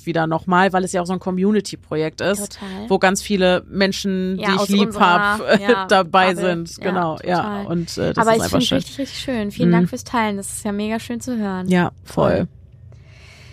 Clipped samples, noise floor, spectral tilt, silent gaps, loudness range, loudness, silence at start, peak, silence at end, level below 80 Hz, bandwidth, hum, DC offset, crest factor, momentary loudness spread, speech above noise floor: under 0.1%; -43 dBFS; -5 dB/octave; none; 4 LU; -19 LUFS; 0.05 s; 0 dBFS; 0 s; -46 dBFS; 15.5 kHz; none; under 0.1%; 18 dB; 9 LU; 24 dB